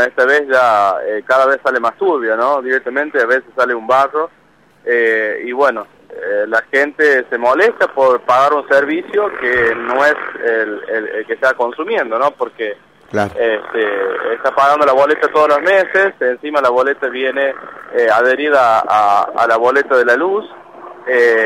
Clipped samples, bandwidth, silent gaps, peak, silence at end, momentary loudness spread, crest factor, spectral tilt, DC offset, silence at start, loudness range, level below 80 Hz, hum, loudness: under 0.1%; 13.5 kHz; none; -2 dBFS; 0 s; 8 LU; 12 dB; -4.5 dB/octave; under 0.1%; 0 s; 4 LU; -58 dBFS; none; -14 LUFS